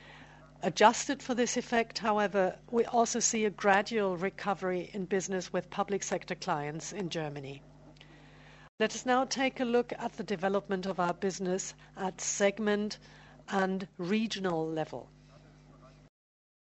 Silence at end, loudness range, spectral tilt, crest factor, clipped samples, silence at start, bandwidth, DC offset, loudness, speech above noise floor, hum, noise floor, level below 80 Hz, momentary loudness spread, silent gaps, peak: 0.8 s; 6 LU; -3.5 dB/octave; 24 dB; under 0.1%; 0 s; 8.2 kHz; under 0.1%; -32 LUFS; 25 dB; 50 Hz at -60 dBFS; -57 dBFS; -66 dBFS; 11 LU; 8.69-8.78 s; -8 dBFS